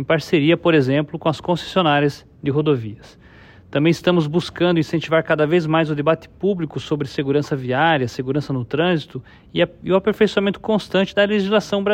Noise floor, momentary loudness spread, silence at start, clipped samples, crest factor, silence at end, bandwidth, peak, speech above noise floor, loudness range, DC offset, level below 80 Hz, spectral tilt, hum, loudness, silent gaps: -45 dBFS; 7 LU; 0 s; under 0.1%; 16 dB; 0 s; 15 kHz; -4 dBFS; 26 dB; 2 LU; under 0.1%; -52 dBFS; -6.5 dB/octave; none; -19 LUFS; none